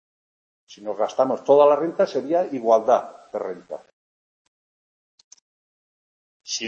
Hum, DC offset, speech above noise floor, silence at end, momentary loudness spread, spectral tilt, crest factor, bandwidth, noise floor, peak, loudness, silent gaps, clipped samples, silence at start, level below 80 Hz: none; under 0.1%; over 69 dB; 0 s; 19 LU; -4 dB/octave; 20 dB; 7.6 kHz; under -90 dBFS; -4 dBFS; -21 LUFS; 3.93-5.18 s, 5.24-5.31 s, 5.41-6.40 s; under 0.1%; 0.7 s; -76 dBFS